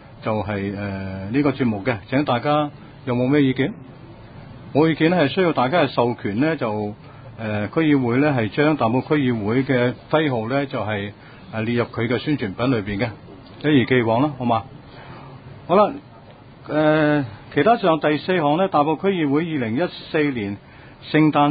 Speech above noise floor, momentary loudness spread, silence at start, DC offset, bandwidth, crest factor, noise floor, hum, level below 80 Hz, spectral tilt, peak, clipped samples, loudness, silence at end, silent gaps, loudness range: 24 dB; 14 LU; 0.05 s; under 0.1%; 5 kHz; 18 dB; -44 dBFS; none; -50 dBFS; -12 dB/octave; -4 dBFS; under 0.1%; -20 LUFS; 0 s; none; 3 LU